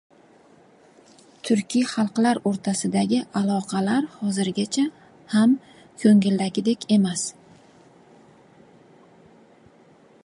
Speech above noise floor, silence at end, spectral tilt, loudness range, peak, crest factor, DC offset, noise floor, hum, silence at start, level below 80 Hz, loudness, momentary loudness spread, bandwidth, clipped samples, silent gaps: 32 dB; 2.95 s; -5.5 dB/octave; 6 LU; -6 dBFS; 18 dB; under 0.1%; -54 dBFS; none; 1.45 s; -70 dBFS; -22 LUFS; 7 LU; 11.5 kHz; under 0.1%; none